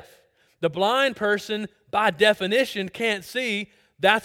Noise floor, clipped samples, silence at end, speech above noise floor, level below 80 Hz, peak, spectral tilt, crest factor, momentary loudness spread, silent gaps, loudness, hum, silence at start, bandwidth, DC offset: -59 dBFS; under 0.1%; 0 s; 35 dB; -66 dBFS; -2 dBFS; -4 dB/octave; 22 dB; 10 LU; none; -23 LUFS; none; 0.6 s; 17 kHz; under 0.1%